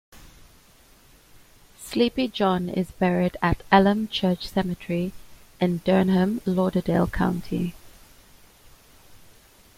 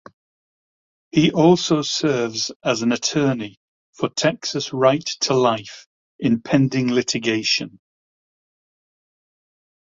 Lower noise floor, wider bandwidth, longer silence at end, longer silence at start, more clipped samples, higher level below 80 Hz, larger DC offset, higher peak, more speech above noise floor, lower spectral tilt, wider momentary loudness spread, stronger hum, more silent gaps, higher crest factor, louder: second, -54 dBFS vs under -90 dBFS; first, 15.5 kHz vs 7.8 kHz; second, 0.6 s vs 2.3 s; second, 0.15 s vs 1.15 s; neither; first, -44 dBFS vs -60 dBFS; neither; about the same, -2 dBFS vs -2 dBFS; second, 32 dB vs over 71 dB; first, -7 dB/octave vs -4.5 dB/octave; about the same, 10 LU vs 9 LU; neither; second, none vs 2.56-2.60 s, 3.57-3.93 s, 5.86-6.19 s; about the same, 24 dB vs 20 dB; second, -24 LUFS vs -20 LUFS